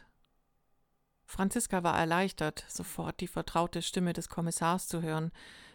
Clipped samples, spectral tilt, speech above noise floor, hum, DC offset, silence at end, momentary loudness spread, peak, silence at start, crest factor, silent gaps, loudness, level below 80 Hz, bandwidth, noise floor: under 0.1%; -4.5 dB/octave; 41 dB; none; under 0.1%; 0.05 s; 10 LU; -14 dBFS; 1.3 s; 20 dB; none; -33 LUFS; -56 dBFS; 19 kHz; -74 dBFS